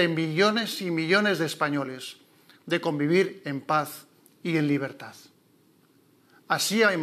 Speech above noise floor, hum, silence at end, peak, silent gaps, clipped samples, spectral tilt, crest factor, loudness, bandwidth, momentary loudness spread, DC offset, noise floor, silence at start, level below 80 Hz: 36 dB; none; 0 s; -8 dBFS; none; under 0.1%; -4.5 dB/octave; 20 dB; -26 LUFS; 15 kHz; 14 LU; under 0.1%; -62 dBFS; 0 s; under -90 dBFS